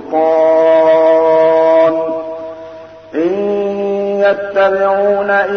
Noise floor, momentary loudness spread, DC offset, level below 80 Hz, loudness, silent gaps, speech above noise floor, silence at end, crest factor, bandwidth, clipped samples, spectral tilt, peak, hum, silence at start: -32 dBFS; 14 LU; 0.1%; -58 dBFS; -12 LUFS; none; 21 dB; 0 s; 10 dB; 6.4 kHz; under 0.1%; -6.5 dB/octave; -2 dBFS; none; 0 s